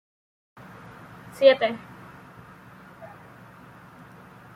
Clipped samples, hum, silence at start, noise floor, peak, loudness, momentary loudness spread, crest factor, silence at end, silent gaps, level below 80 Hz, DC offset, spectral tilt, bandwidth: under 0.1%; none; 1.4 s; -48 dBFS; -4 dBFS; -21 LUFS; 29 LU; 24 dB; 1.5 s; none; -66 dBFS; under 0.1%; -5 dB/octave; 13 kHz